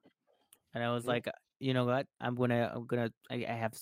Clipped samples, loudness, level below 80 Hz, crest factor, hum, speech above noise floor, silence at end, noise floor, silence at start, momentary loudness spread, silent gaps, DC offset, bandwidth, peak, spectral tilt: under 0.1%; -35 LUFS; -74 dBFS; 18 dB; none; 36 dB; 0 s; -70 dBFS; 0.75 s; 8 LU; 1.56-1.60 s, 3.17-3.21 s; under 0.1%; 16 kHz; -18 dBFS; -6.5 dB/octave